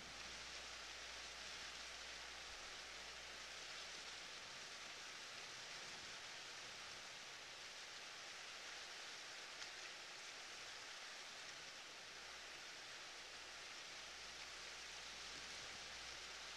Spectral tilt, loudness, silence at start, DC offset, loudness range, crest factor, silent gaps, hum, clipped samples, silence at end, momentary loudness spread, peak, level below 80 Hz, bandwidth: 0 dB/octave; -52 LUFS; 0 s; under 0.1%; 1 LU; 18 dB; none; none; under 0.1%; 0 s; 2 LU; -36 dBFS; -76 dBFS; 13 kHz